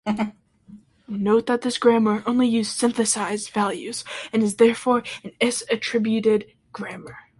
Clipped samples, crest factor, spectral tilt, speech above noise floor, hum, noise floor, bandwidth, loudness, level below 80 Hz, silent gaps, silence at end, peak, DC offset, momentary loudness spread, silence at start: under 0.1%; 18 dB; -4 dB/octave; 27 dB; none; -48 dBFS; 11.5 kHz; -22 LUFS; -62 dBFS; none; 0.2 s; -4 dBFS; under 0.1%; 16 LU; 0.05 s